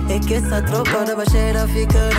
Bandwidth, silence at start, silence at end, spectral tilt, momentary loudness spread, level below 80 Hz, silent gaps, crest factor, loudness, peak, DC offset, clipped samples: 16.5 kHz; 0 s; 0 s; -5.5 dB/octave; 2 LU; -20 dBFS; none; 10 dB; -18 LUFS; -8 dBFS; under 0.1%; under 0.1%